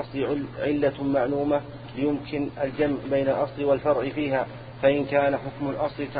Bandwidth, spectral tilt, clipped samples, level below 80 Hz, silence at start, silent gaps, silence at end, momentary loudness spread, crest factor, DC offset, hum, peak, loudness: 5 kHz; -11 dB/octave; under 0.1%; -52 dBFS; 0 s; none; 0 s; 6 LU; 16 dB; under 0.1%; none; -8 dBFS; -26 LUFS